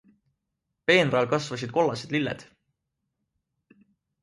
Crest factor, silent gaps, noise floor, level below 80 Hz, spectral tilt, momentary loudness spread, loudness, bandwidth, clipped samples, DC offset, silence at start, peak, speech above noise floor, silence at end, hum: 22 dB; none; -82 dBFS; -66 dBFS; -5 dB/octave; 11 LU; -25 LUFS; 11.5 kHz; under 0.1%; under 0.1%; 0.9 s; -6 dBFS; 57 dB; 1.8 s; none